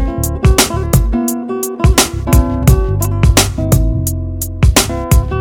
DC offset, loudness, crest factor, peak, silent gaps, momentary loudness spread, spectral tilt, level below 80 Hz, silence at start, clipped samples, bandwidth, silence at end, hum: under 0.1%; -13 LUFS; 12 dB; 0 dBFS; none; 7 LU; -4.5 dB/octave; -16 dBFS; 0 s; 0.3%; over 20 kHz; 0 s; none